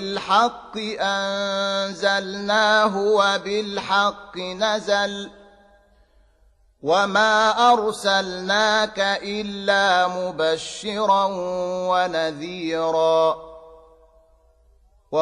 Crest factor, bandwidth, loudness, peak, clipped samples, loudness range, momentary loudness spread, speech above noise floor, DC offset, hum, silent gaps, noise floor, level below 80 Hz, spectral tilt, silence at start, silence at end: 16 dB; 12 kHz; -21 LUFS; -6 dBFS; under 0.1%; 5 LU; 10 LU; 37 dB; under 0.1%; none; none; -58 dBFS; -58 dBFS; -3 dB/octave; 0 s; 0 s